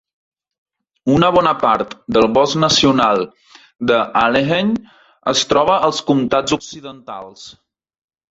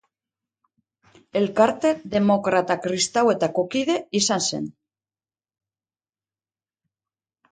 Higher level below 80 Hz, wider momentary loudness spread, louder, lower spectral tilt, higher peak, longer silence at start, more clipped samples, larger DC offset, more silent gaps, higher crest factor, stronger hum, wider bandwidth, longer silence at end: first, -48 dBFS vs -64 dBFS; first, 18 LU vs 6 LU; first, -15 LUFS vs -22 LUFS; about the same, -4.5 dB/octave vs -4 dB/octave; first, 0 dBFS vs -4 dBFS; second, 1.05 s vs 1.35 s; neither; neither; neither; about the same, 16 dB vs 20 dB; neither; second, 8 kHz vs 9.6 kHz; second, 0.8 s vs 2.8 s